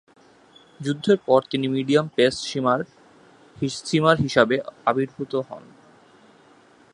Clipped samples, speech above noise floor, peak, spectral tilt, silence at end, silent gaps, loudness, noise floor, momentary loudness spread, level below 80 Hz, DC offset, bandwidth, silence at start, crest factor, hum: under 0.1%; 32 dB; -2 dBFS; -5.5 dB/octave; 1.35 s; none; -22 LUFS; -54 dBFS; 11 LU; -60 dBFS; under 0.1%; 11 kHz; 0.8 s; 22 dB; none